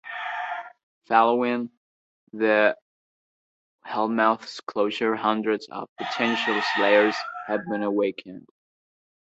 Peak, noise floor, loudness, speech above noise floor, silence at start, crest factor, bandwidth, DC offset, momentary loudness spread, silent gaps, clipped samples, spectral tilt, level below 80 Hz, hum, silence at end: -4 dBFS; under -90 dBFS; -24 LUFS; over 67 dB; 0.05 s; 22 dB; 8 kHz; under 0.1%; 14 LU; 0.83-1.01 s, 1.77-2.27 s, 2.82-3.79 s, 5.89-5.96 s; under 0.1%; -5 dB/octave; -74 dBFS; none; 0.8 s